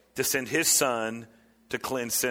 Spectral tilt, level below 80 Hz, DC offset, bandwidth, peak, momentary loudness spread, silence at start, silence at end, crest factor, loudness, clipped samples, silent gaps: -1.5 dB/octave; -64 dBFS; under 0.1%; 17.5 kHz; -12 dBFS; 14 LU; 0.15 s; 0 s; 18 dB; -26 LUFS; under 0.1%; none